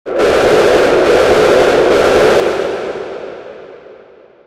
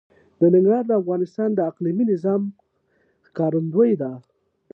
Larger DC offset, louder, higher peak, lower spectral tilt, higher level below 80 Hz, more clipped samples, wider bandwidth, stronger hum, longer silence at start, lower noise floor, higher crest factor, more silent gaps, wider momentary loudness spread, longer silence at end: neither; first, -10 LUFS vs -21 LUFS; first, 0 dBFS vs -6 dBFS; second, -4.5 dB/octave vs -11.5 dB/octave; first, -38 dBFS vs -72 dBFS; neither; first, 15.5 kHz vs 5.8 kHz; neither; second, 0.05 s vs 0.4 s; second, -41 dBFS vs -65 dBFS; about the same, 12 dB vs 14 dB; neither; first, 16 LU vs 11 LU; about the same, 0.55 s vs 0.55 s